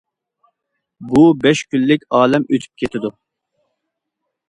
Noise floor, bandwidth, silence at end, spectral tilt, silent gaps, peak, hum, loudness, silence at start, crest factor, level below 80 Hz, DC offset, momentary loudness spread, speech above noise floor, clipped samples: -77 dBFS; 11 kHz; 1.4 s; -6 dB/octave; none; 0 dBFS; none; -15 LUFS; 1 s; 18 dB; -52 dBFS; under 0.1%; 12 LU; 63 dB; under 0.1%